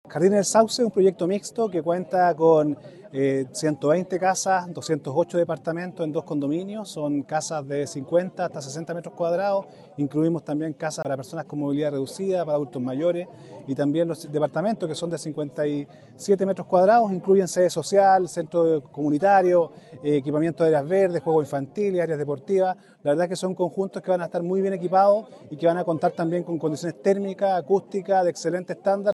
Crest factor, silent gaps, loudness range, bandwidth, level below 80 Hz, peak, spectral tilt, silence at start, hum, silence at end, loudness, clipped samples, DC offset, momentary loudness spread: 18 dB; none; 6 LU; 12.5 kHz; -74 dBFS; -6 dBFS; -5.5 dB/octave; 0.1 s; none; 0 s; -24 LUFS; under 0.1%; under 0.1%; 11 LU